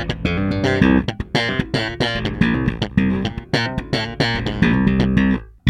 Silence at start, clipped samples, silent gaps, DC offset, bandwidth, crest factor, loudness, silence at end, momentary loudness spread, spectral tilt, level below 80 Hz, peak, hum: 0 s; under 0.1%; none; under 0.1%; 10.5 kHz; 18 dB; -19 LUFS; 0 s; 6 LU; -6.5 dB/octave; -32 dBFS; 0 dBFS; none